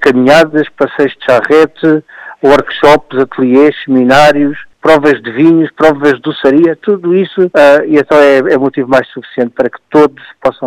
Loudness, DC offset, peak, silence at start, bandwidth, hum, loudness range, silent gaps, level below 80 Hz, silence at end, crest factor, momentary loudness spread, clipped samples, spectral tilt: -9 LUFS; under 0.1%; 0 dBFS; 0 s; 15 kHz; none; 1 LU; none; -44 dBFS; 0 s; 8 dB; 8 LU; 0.4%; -6 dB/octave